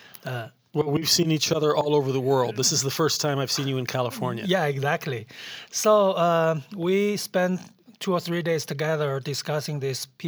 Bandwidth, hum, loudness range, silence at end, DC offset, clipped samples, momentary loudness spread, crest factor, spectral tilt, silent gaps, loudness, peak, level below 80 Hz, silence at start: over 20 kHz; none; 4 LU; 0 s; under 0.1%; under 0.1%; 11 LU; 18 dB; -4 dB/octave; none; -24 LUFS; -6 dBFS; -70 dBFS; 0.25 s